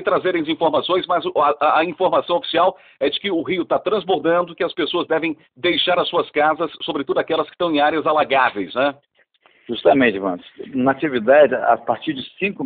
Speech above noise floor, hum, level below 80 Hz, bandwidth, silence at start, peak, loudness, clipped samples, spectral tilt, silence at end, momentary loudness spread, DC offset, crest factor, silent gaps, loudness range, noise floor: 38 dB; none; -60 dBFS; 4.7 kHz; 0 s; -2 dBFS; -19 LUFS; under 0.1%; -2 dB/octave; 0 s; 8 LU; under 0.1%; 16 dB; none; 2 LU; -57 dBFS